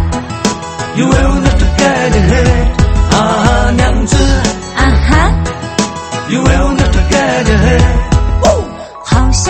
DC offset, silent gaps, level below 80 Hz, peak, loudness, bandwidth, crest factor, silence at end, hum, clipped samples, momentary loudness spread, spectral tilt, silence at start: under 0.1%; none; -14 dBFS; 0 dBFS; -11 LUFS; 8.8 kHz; 10 dB; 0 s; none; 0.3%; 7 LU; -5 dB/octave; 0 s